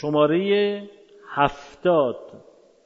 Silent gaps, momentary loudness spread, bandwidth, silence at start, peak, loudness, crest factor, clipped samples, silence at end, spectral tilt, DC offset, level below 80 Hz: none; 12 LU; 7.4 kHz; 0 s; -4 dBFS; -22 LUFS; 20 dB; under 0.1%; 0.45 s; -7 dB/octave; under 0.1%; -54 dBFS